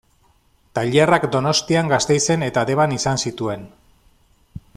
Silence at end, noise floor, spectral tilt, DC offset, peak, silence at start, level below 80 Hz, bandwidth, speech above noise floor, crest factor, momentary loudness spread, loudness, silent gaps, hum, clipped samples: 0.15 s; -58 dBFS; -4.5 dB/octave; under 0.1%; -2 dBFS; 0.75 s; -50 dBFS; 14 kHz; 40 dB; 18 dB; 11 LU; -18 LUFS; none; none; under 0.1%